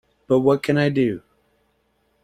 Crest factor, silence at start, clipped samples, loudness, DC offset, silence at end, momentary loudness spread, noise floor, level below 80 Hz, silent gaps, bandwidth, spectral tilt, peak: 18 dB; 0.3 s; under 0.1%; -20 LUFS; under 0.1%; 1.05 s; 6 LU; -66 dBFS; -58 dBFS; none; 14.5 kHz; -7.5 dB/octave; -4 dBFS